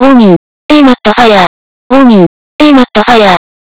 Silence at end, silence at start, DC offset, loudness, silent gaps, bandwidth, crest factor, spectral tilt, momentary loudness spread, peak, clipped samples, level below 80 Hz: 0.4 s; 0 s; 6%; -5 LUFS; 0.36-0.69 s, 1.47-1.90 s, 2.26-2.59 s; 4 kHz; 6 dB; -10 dB/octave; 7 LU; 0 dBFS; 20%; -36 dBFS